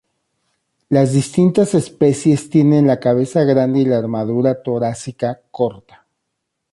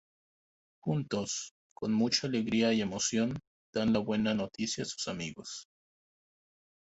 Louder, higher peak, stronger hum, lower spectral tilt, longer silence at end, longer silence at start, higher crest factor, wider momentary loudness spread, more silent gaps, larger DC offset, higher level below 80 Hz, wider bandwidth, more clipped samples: first, -16 LUFS vs -32 LUFS; first, -2 dBFS vs -14 dBFS; neither; first, -7.5 dB/octave vs -4 dB/octave; second, 0.95 s vs 1.3 s; about the same, 0.9 s vs 0.85 s; second, 14 dB vs 20 dB; second, 8 LU vs 12 LU; second, none vs 1.51-1.76 s, 3.47-3.73 s; neither; first, -56 dBFS vs -64 dBFS; first, 11.5 kHz vs 8.2 kHz; neither